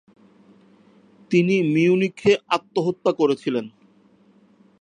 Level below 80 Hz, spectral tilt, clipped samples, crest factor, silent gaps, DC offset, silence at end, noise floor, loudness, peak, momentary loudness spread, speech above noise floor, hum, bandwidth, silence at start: -66 dBFS; -6.5 dB/octave; under 0.1%; 18 dB; none; under 0.1%; 1.15 s; -56 dBFS; -21 LUFS; -6 dBFS; 7 LU; 36 dB; none; 10 kHz; 1.3 s